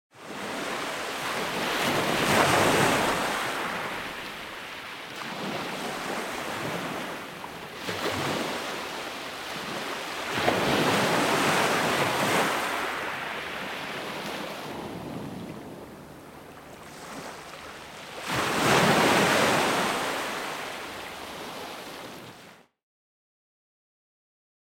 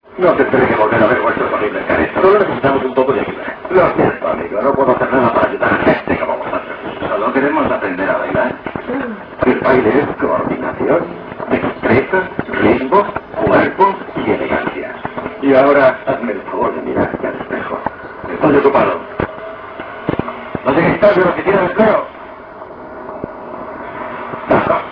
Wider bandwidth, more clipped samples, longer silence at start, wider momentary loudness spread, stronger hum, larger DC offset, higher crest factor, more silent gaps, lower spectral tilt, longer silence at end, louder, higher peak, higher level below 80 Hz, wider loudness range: first, 17.5 kHz vs 5.4 kHz; neither; about the same, 0.15 s vs 0.1 s; first, 19 LU vs 15 LU; neither; neither; first, 22 dB vs 14 dB; neither; second, -3.5 dB/octave vs -9.5 dB/octave; first, 2.15 s vs 0 s; second, -27 LUFS vs -15 LUFS; second, -6 dBFS vs 0 dBFS; second, -58 dBFS vs -42 dBFS; first, 14 LU vs 3 LU